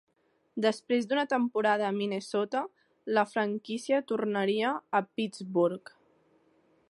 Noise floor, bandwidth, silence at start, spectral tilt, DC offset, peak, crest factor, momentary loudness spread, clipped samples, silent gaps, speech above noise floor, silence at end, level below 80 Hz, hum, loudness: -69 dBFS; 11.5 kHz; 0.55 s; -5.5 dB/octave; under 0.1%; -12 dBFS; 18 dB; 8 LU; under 0.1%; none; 40 dB; 1.1 s; -82 dBFS; none; -30 LUFS